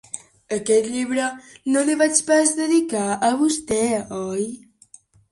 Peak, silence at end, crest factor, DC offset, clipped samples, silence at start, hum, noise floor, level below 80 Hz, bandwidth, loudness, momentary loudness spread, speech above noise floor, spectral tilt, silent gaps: -2 dBFS; 0.75 s; 20 dB; under 0.1%; under 0.1%; 0.15 s; none; -51 dBFS; -58 dBFS; 11.5 kHz; -21 LUFS; 12 LU; 31 dB; -3 dB/octave; none